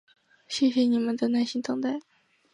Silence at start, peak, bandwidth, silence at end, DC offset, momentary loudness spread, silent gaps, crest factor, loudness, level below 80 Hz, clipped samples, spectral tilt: 0.5 s; -12 dBFS; 11 kHz; 0.55 s; under 0.1%; 9 LU; none; 14 dB; -27 LUFS; -78 dBFS; under 0.1%; -4.5 dB/octave